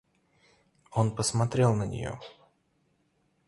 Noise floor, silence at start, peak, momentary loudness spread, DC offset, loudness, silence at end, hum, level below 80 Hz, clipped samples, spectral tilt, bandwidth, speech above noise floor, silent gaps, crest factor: -72 dBFS; 0.9 s; -10 dBFS; 15 LU; under 0.1%; -28 LUFS; 1.15 s; none; -56 dBFS; under 0.1%; -5.5 dB/octave; 11.5 kHz; 44 dB; none; 20 dB